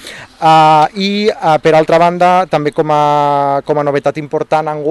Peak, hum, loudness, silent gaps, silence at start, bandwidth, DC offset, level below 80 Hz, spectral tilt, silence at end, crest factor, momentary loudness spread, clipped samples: -2 dBFS; none; -11 LUFS; none; 0 s; 12.5 kHz; under 0.1%; -50 dBFS; -6 dB/octave; 0 s; 10 dB; 7 LU; under 0.1%